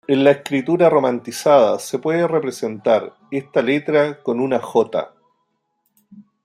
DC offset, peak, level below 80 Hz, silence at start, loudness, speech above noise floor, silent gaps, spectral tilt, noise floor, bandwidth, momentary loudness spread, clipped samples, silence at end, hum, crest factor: under 0.1%; -2 dBFS; -68 dBFS; 0.1 s; -18 LUFS; 53 dB; none; -5.5 dB/octave; -70 dBFS; 14.5 kHz; 8 LU; under 0.1%; 0.25 s; none; 18 dB